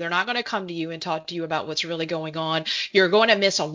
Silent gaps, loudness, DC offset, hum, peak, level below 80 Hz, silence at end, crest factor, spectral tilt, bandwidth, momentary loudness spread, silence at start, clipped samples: none; -23 LUFS; under 0.1%; none; -4 dBFS; -68 dBFS; 0 s; 20 dB; -3.5 dB/octave; 7.6 kHz; 11 LU; 0 s; under 0.1%